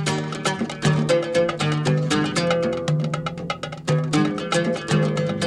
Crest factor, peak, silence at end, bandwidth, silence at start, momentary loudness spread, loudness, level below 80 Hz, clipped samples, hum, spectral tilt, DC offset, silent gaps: 16 dB; -6 dBFS; 0 s; 11.5 kHz; 0 s; 6 LU; -22 LUFS; -54 dBFS; under 0.1%; none; -5.5 dB/octave; under 0.1%; none